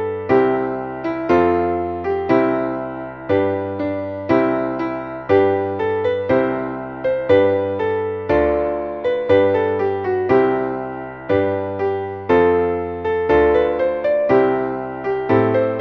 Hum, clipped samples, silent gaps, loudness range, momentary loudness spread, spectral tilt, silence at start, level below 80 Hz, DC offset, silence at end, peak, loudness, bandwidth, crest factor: none; under 0.1%; none; 2 LU; 9 LU; -9 dB/octave; 0 s; -44 dBFS; under 0.1%; 0 s; -2 dBFS; -18 LUFS; 6.2 kHz; 16 dB